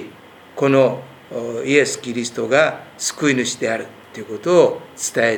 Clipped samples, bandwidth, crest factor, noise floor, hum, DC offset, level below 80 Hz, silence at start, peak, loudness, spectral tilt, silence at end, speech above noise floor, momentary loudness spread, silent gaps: under 0.1%; 19 kHz; 20 dB; -42 dBFS; none; under 0.1%; -68 dBFS; 0 s; 0 dBFS; -18 LUFS; -4 dB/octave; 0 s; 24 dB; 17 LU; none